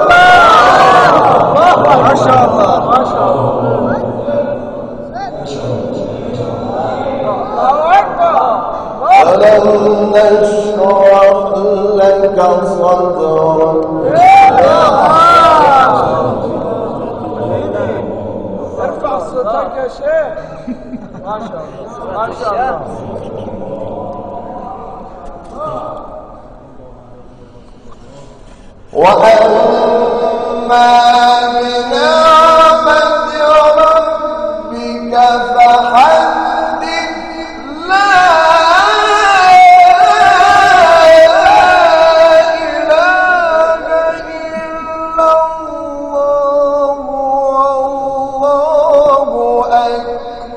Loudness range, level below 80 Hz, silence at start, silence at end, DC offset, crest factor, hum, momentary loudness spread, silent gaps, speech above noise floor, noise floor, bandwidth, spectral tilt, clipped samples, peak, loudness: 14 LU; -38 dBFS; 0 s; 0 s; under 0.1%; 10 dB; none; 18 LU; none; 29 dB; -35 dBFS; 11 kHz; -4.5 dB/octave; 0.7%; 0 dBFS; -9 LUFS